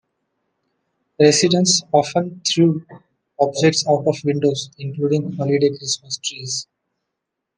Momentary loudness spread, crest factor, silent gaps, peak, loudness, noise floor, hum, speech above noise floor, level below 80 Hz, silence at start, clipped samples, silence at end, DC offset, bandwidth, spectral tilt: 11 LU; 18 dB; none; -2 dBFS; -18 LUFS; -80 dBFS; none; 62 dB; -66 dBFS; 1.2 s; under 0.1%; 0.95 s; under 0.1%; 10.5 kHz; -4 dB/octave